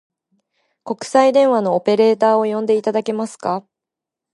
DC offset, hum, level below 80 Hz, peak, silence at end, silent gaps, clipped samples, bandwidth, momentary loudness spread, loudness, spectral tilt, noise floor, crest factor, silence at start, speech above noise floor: under 0.1%; none; -72 dBFS; 0 dBFS; 0.75 s; none; under 0.1%; 11.5 kHz; 11 LU; -17 LUFS; -5.5 dB/octave; -85 dBFS; 18 dB; 0.85 s; 69 dB